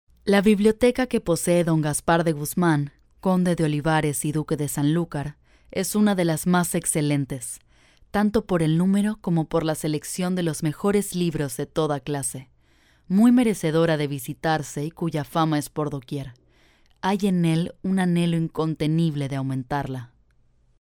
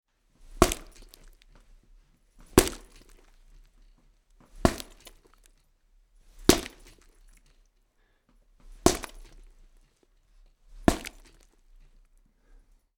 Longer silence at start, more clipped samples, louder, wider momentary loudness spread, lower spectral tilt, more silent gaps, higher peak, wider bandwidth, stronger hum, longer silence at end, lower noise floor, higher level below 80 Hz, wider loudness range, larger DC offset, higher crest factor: second, 0.25 s vs 0.55 s; neither; first, -23 LUFS vs -27 LUFS; second, 9 LU vs 20 LU; first, -6 dB/octave vs -4 dB/octave; neither; second, -6 dBFS vs -2 dBFS; about the same, 19.5 kHz vs 18 kHz; neither; second, 0.75 s vs 1.9 s; second, -60 dBFS vs -68 dBFS; second, -50 dBFS vs -42 dBFS; second, 3 LU vs 6 LU; neither; second, 18 dB vs 32 dB